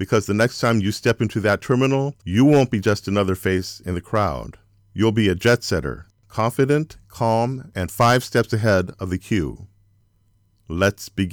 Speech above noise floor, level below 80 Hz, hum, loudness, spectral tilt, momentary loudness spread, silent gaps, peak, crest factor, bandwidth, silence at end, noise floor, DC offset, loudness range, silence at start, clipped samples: 41 dB; -46 dBFS; none; -20 LUFS; -6 dB/octave; 11 LU; none; -6 dBFS; 16 dB; 20 kHz; 0 s; -61 dBFS; under 0.1%; 3 LU; 0 s; under 0.1%